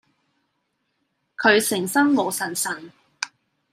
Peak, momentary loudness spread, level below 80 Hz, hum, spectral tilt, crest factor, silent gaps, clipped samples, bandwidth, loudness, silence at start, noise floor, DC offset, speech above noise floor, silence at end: -2 dBFS; 15 LU; -76 dBFS; none; -3 dB/octave; 22 dB; none; under 0.1%; 15.5 kHz; -21 LUFS; 1.4 s; -74 dBFS; under 0.1%; 53 dB; 0.45 s